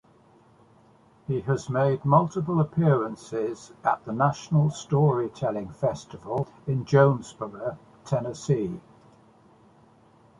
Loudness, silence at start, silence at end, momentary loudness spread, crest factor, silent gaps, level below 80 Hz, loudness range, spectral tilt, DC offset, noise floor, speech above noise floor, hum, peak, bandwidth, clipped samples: -26 LUFS; 1.3 s; 1.6 s; 12 LU; 22 dB; none; -60 dBFS; 3 LU; -7.5 dB/octave; under 0.1%; -57 dBFS; 32 dB; none; -4 dBFS; 10.5 kHz; under 0.1%